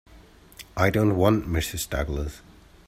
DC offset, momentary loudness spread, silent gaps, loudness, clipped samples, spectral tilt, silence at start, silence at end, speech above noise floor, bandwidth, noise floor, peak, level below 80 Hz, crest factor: under 0.1%; 15 LU; none; -24 LUFS; under 0.1%; -5.5 dB/octave; 0.15 s; 0.5 s; 27 dB; 16 kHz; -51 dBFS; -6 dBFS; -38 dBFS; 20 dB